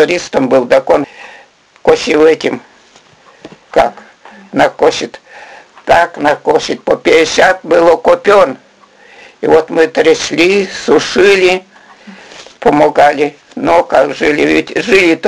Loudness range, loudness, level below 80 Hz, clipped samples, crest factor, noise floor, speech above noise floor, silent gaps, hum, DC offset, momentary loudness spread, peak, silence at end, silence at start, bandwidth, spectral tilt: 4 LU; -10 LUFS; -44 dBFS; 0.4%; 12 dB; -43 dBFS; 34 dB; none; none; under 0.1%; 8 LU; 0 dBFS; 0 s; 0 s; 11.5 kHz; -4 dB/octave